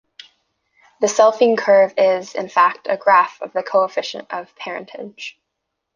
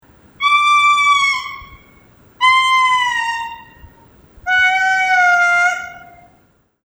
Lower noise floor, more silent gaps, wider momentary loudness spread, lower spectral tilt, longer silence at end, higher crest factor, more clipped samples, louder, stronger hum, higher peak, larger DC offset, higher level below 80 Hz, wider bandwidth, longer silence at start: first, -78 dBFS vs -56 dBFS; neither; about the same, 17 LU vs 16 LU; first, -3 dB/octave vs 0.5 dB/octave; second, 0.65 s vs 0.8 s; about the same, 16 dB vs 14 dB; neither; second, -17 LUFS vs -13 LUFS; neither; about the same, -2 dBFS vs -2 dBFS; neither; second, -72 dBFS vs -52 dBFS; second, 9.8 kHz vs over 20 kHz; first, 1 s vs 0.4 s